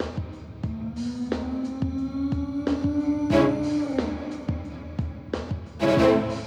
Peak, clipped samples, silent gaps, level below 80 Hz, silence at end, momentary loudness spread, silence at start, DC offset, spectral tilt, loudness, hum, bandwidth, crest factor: -8 dBFS; under 0.1%; none; -42 dBFS; 0 s; 13 LU; 0 s; under 0.1%; -7.5 dB/octave; -26 LUFS; none; 10.5 kHz; 18 dB